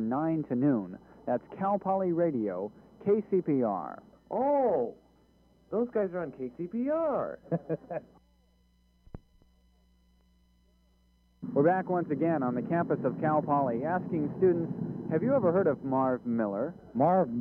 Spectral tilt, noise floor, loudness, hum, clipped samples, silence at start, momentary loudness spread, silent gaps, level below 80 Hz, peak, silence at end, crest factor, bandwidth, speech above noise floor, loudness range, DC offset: -11.5 dB/octave; -66 dBFS; -30 LUFS; none; under 0.1%; 0 s; 10 LU; none; -66 dBFS; -14 dBFS; 0 s; 18 dB; 5.2 kHz; 37 dB; 7 LU; under 0.1%